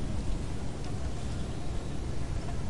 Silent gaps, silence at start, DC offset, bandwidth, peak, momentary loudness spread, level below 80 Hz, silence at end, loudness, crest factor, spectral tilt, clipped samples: none; 0 s; 2%; 11.5 kHz; -18 dBFS; 2 LU; -38 dBFS; 0 s; -37 LUFS; 14 dB; -6 dB/octave; under 0.1%